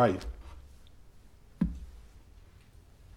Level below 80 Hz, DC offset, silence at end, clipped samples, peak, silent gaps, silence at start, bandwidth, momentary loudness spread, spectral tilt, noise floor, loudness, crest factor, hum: -48 dBFS; under 0.1%; 0.95 s; under 0.1%; -12 dBFS; none; 0 s; 15 kHz; 24 LU; -7.5 dB/octave; -56 dBFS; -35 LUFS; 22 dB; none